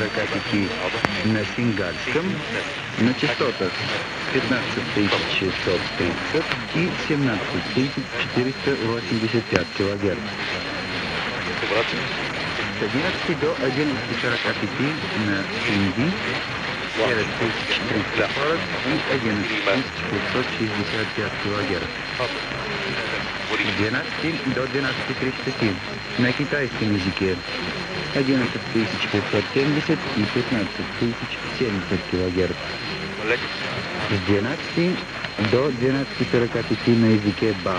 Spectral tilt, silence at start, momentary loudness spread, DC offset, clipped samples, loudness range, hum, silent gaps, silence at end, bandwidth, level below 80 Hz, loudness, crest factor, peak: -5.5 dB/octave; 0 s; 5 LU; under 0.1%; under 0.1%; 2 LU; none; none; 0 s; 9.8 kHz; -50 dBFS; -23 LUFS; 24 dB; 0 dBFS